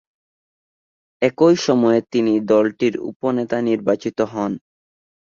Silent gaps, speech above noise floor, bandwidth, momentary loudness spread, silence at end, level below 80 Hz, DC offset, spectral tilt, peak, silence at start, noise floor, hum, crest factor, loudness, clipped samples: 3.16-3.20 s; over 72 dB; 7.6 kHz; 8 LU; 0.6 s; -62 dBFS; under 0.1%; -6 dB/octave; -2 dBFS; 1.2 s; under -90 dBFS; none; 18 dB; -19 LUFS; under 0.1%